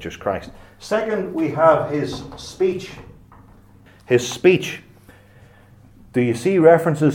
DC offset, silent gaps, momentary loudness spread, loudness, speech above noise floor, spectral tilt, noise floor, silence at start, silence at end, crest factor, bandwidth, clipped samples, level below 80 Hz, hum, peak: under 0.1%; none; 17 LU; -19 LUFS; 30 dB; -6 dB/octave; -48 dBFS; 0 s; 0 s; 20 dB; 16.5 kHz; under 0.1%; -52 dBFS; none; 0 dBFS